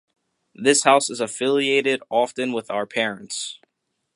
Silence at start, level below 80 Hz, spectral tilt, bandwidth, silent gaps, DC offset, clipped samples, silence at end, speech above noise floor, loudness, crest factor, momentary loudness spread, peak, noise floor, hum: 0.6 s; -76 dBFS; -2 dB/octave; 11.5 kHz; none; under 0.1%; under 0.1%; 0.6 s; 55 dB; -21 LUFS; 20 dB; 12 LU; -2 dBFS; -77 dBFS; none